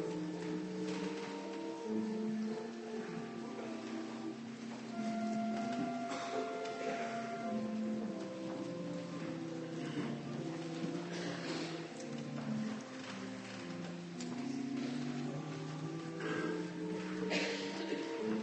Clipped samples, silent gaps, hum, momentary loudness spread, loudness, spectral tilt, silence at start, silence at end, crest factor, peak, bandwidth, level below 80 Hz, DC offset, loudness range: under 0.1%; none; none; 6 LU; -41 LUFS; -5.5 dB/octave; 0 s; 0 s; 18 dB; -24 dBFS; 8.4 kHz; -78 dBFS; under 0.1%; 3 LU